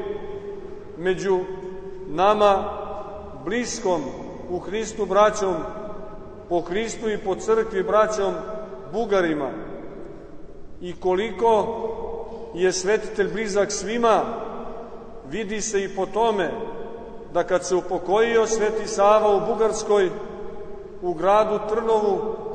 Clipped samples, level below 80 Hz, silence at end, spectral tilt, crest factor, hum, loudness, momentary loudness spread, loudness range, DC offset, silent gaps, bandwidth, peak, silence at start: under 0.1%; -46 dBFS; 0 s; -4 dB/octave; 20 dB; none; -23 LUFS; 18 LU; 4 LU; under 0.1%; none; 9.4 kHz; -4 dBFS; 0 s